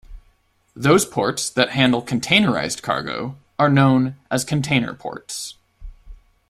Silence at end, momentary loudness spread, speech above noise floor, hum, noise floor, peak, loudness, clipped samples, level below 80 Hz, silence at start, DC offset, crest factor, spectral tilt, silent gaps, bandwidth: 0.35 s; 14 LU; 41 dB; none; -60 dBFS; 0 dBFS; -19 LUFS; under 0.1%; -46 dBFS; 0.1 s; under 0.1%; 20 dB; -4.5 dB/octave; none; 15.5 kHz